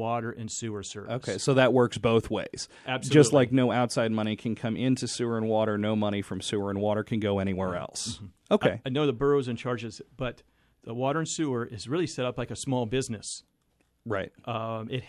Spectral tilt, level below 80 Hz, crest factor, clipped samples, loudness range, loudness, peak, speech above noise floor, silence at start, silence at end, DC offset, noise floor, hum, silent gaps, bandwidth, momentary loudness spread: -5.5 dB/octave; -56 dBFS; 22 dB; under 0.1%; 7 LU; -28 LUFS; -6 dBFS; 43 dB; 0 s; 0 s; under 0.1%; -71 dBFS; none; none; 12.5 kHz; 13 LU